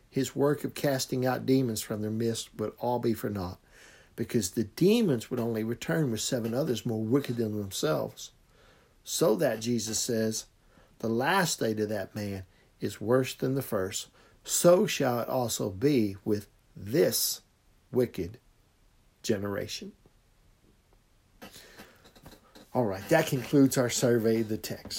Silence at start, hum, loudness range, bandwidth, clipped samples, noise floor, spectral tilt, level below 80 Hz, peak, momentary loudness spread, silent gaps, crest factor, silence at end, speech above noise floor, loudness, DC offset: 0.15 s; none; 8 LU; 16.5 kHz; under 0.1%; -64 dBFS; -4.5 dB/octave; -64 dBFS; -10 dBFS; 14 LU; none; 20 dB; 0 s; 35 dB; -29 LUFS; under 0.1%